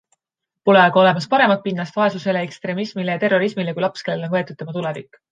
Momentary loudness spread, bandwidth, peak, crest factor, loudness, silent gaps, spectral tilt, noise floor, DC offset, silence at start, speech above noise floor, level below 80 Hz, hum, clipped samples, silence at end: 12 LU; 9.2 kHz; -2 dBFS; 18 dB; -19 LUFS; none; -6.5 dB/octave; -83 dBFS; under 0.1%; 0.65 s; 65 dB; -70 dBFS; none; under 0.1%; 0.3 s